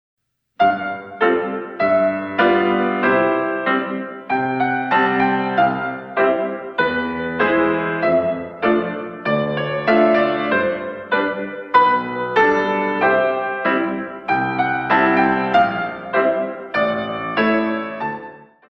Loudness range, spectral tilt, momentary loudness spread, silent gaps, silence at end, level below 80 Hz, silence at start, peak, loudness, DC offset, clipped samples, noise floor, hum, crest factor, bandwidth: 2 LU; -7.5 dB/octave; 8 LU; none; 0.25 s; -56 dBFS; 0.6 s; -2 dBFS; -18 LUFS; under 0.1%; under 0.1%; -39 dBFS; none; 16 dB; 6.2 kHz